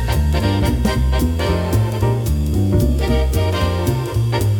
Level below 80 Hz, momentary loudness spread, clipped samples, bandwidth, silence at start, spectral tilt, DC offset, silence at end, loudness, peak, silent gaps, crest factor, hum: -22 dBFS; 2 LU; under 0.1%; 18 kHz; 0 s; -6.5 dB/octave; under 0.1%; 0 s; -18 LUFS; -4 dBFS; none; 12 dB; none